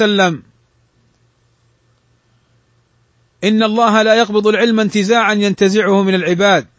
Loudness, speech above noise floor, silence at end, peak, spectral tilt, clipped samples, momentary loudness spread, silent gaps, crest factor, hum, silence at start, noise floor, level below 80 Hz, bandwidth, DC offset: -13 LUFS; 45 dB; 0.15 s; 0 dBFS; -5 dB/octave; under 0.1%; 4 LU; none; 14 dB; none; 0 s; -57 dBFS; -60 dBFS; 8 kHz; under 0.1%